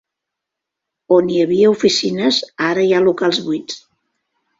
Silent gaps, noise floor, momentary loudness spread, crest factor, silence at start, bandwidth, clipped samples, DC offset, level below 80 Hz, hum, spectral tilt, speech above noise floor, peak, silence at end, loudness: none; -82 dBFS; 10 LU; 16 dB; 1.1 s; 7.8 kHz; under 0.1%; under 0.1%; -60 dBFS; none; -4.5 dB/octave; 67 dB; -2 dBFS; 0.8 s; -15 LUFS